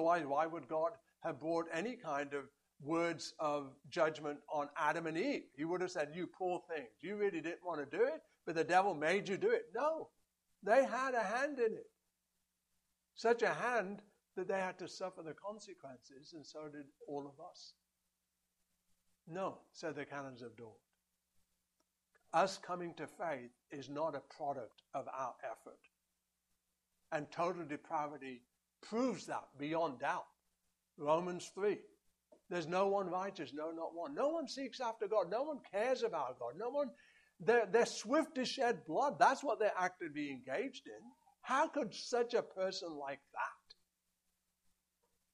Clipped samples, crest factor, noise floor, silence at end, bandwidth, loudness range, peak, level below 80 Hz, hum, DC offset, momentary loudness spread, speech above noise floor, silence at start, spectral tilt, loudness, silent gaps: under 0.1%; 24 dB; -87 dBFS; 1.8 s; 12 kHz; 13 LU; -16 dBFS; -86 dBFS; none; under 0.1%; 16 LU; 48 dB; 0 s; -4.5 dB/octave; -39 LUFS; none